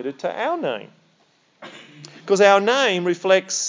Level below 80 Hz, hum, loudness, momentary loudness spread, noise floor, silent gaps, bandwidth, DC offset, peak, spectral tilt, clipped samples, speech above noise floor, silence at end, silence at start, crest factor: -90 dBFS; none; -19 LUFS; 22 LU; -61 dBFS; none; 7.6 kHz; under 0.1%; -2 dBFS; -3 dB/octave; under 0.1%; 42 dB; 0 s; 0 s; 20 dB